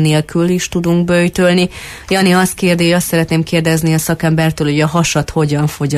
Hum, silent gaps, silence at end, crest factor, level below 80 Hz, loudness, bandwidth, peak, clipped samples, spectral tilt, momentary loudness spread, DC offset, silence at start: none; none; 0 s; 12 dB; -38 dBFS; -13 LUFS; 15.5 kHz; -2 dBFS; under 0.1%; -5.5 dB/octave; 4 LU; under 0.1%; 0 s